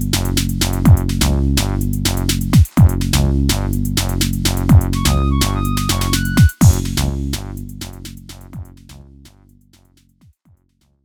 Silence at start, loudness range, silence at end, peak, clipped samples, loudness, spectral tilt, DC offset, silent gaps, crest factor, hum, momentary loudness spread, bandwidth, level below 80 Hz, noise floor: 0 s; 12 LU; 2.05 s; 0 dBFS; under 0.1%; -16 LUFS; -5 dB/octave; under 0.1%; none; 16 dB; none; 18 LU; 19.5 kHz; -22 dBFS; -59 dBFS